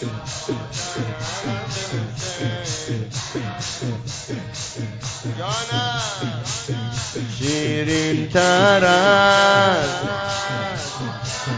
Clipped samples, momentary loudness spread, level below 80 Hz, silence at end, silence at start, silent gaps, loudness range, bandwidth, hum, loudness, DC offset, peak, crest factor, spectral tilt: under 0.1%; 14 LU; -48 dBFS; 0 s; 0 s; none; 10 LU; 8 kHz; none; -21 LUFS; under 0.1%; -2 dBFS; 20 dB; -4 dB/octave